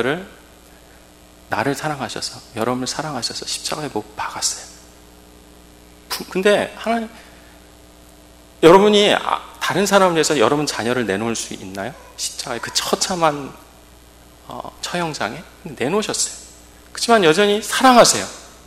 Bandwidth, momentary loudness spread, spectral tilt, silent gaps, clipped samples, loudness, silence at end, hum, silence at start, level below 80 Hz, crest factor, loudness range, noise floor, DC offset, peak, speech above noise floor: 16 kHz; 18 LU; -3 dB/octave; none; 0.1%; -18 LUFS; 0.15 s; none; 0 s; -50 dBFS; 20 dB; 9 LU; -46 dBFS; under 0.1%; 0 dBFS; 28 dB